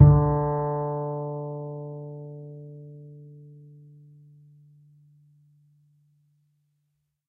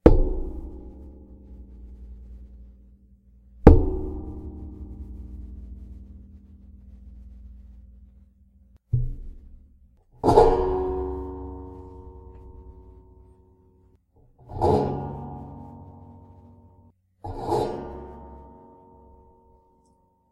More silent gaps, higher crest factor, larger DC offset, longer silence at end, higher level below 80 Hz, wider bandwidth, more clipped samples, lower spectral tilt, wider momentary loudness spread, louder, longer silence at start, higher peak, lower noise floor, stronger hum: neither; about the same, 26 dB vs 26 dB; neither; first, 3.95 s vs 1.9 s; second, -42 dBFS vs -32 dBFS; second, 2 kHz vs 10.5 kHz; neither; first, -14.5 dB/octave vs -9 dB/octave; second, 25 LU vs 29 LU; second, -27 LUFS vs -24 LUFS; about the same, 0 s vs 0.05 s; about the same, -2 dBFS vs 0 dBFS; first, -76 dBFS vs -64 dBFS; neither